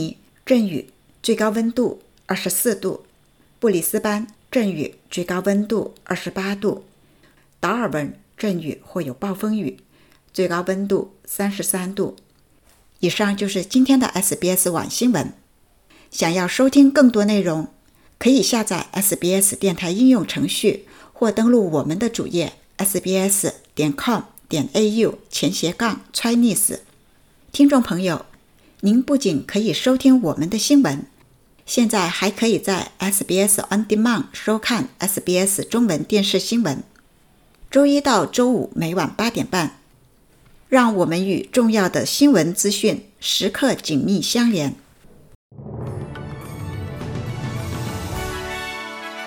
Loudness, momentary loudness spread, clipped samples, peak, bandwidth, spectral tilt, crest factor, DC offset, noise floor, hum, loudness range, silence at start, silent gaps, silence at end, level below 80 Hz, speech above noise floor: -19 LUFS; 13 LU; under 0.1%; -2 dBFS; 19 kHz; -4 dB/octave; 18 dB; under 0.1%; -57 dBFS; none; 7 LU; 0 s; 45.35-45.50 s; 0 s; -50 dBFS; 38 dB